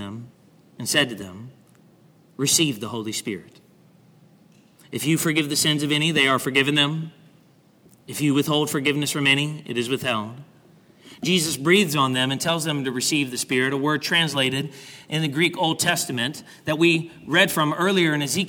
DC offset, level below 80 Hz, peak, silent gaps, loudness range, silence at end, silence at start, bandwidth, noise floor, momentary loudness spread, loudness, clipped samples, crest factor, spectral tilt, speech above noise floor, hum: under 0.1%; -66 dBFS; -4 dBFS; none; 4 LU; 0 s; 0 s; 19.5 kHz; -56 dBFS; 13 LU; -21 LUFS; under 0.1%; 20 dB; -3.5 dB/octave; 33 dB; none